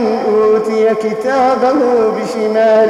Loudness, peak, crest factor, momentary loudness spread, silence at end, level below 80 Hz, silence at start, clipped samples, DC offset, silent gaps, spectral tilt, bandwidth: -13 LUFS; -2 dBFS; 10 dB; 4 LU; 0 s; -54 dBFS; 0 s; under 0.1%; under 0.1%; none; -5.5 dB/octave; 11.5 kHz